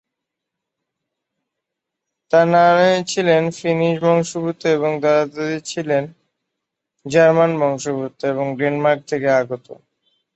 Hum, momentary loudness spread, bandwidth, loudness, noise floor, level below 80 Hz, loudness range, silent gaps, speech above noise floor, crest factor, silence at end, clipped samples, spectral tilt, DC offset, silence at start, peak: none; 11 LU; 8.2 kHz; -17 LUFS; -81 dBFS; -64 dBFS; 3 LU; none; 64 dB; 18 dB; 0.6 s; under 0.1%; -5.5 dB/octave; under 0.1%; 2.3 s; -2 dBFS